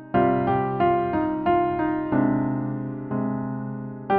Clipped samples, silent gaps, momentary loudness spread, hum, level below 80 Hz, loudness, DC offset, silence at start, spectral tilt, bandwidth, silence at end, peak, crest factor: under 0.1%; none; 9 LU; none; -50 dBFS; -24 LUFS; under 0.1%; 0 s; -7.5 dB/octave; 4.6 kHz; 0 s; -8 dBFS; 14 dB